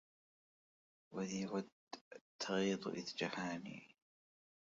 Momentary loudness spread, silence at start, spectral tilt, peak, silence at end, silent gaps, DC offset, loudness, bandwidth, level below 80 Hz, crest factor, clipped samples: 17 LU; 1.1 s; -4 dB/octave; -26 dBFS; 0.85 s; 1.72-1.87 s, 2.01-2.11 s, 2.21-2.39 s; under 0.1%; -43 LUFS; 7.4 kHz; -84 dBFS; 20 dB; under 0.1%